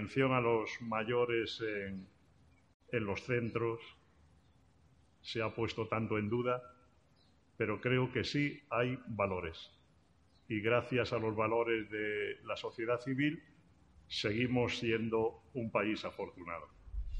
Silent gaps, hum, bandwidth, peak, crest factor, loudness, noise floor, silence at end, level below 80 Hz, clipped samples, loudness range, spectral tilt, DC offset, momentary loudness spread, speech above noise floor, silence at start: 2.74-2.80 s; none; 9.4 kHz; -16 dBFS; 20 dB; -36 LUFS; -69 dBFS; 0 s; -58 dBFS; under 0.1%; 4 LU; -6.5 dB/octave; under 0.1%; 12 LU; 33 dB; 0 s